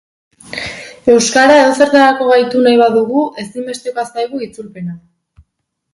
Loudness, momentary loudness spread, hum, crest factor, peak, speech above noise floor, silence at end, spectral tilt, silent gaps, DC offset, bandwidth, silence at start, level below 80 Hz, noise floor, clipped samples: -11 LUFS; 18 LU; none; 14 dB; 0 dBFS; 60 dB; 0.95 s; -3.5 dB/octave; none; under 0.1%; 11.5 kHz; 0.5 s; -54 dBFS; -71 dBFS; under 0.1%